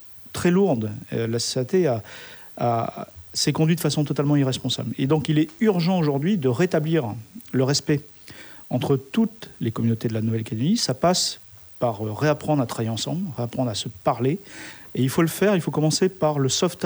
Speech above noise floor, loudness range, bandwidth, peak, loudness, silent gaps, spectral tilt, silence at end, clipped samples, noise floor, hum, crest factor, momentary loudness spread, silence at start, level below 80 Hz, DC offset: 20 dB; 3 LU; over 20 kHz; -6 dBFS; -23 LUFS; none; -5.5 dB/octave; 0 s; under 0.1%; -43 dBFS; none; 16 dB; 11 LU; 0 s; -58 dBFS; under 0.1%